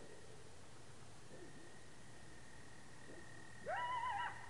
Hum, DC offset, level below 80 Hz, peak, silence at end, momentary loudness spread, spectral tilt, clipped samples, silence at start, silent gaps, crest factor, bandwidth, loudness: none; 0.2%; -74 dBFS; -32 dBFS; 0 s; 18 LU; -3.5 dB/octave; under 0.1%; 0 s; none; 18 dB; 11.5 kHz; -50 LUFS